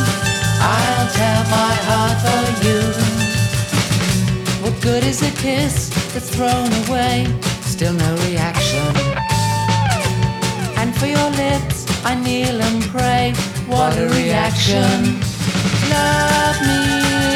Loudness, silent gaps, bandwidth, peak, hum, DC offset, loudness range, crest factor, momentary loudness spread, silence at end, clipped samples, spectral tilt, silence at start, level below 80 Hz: -17 LUFS; none; 17.5 kHz; -2 dBFS; none; under 0.1%; 2 LU; 16 dB; 5 LU; 0 s; under 0.1%; -4.5 dB/octave; 0 s; -34 dBFS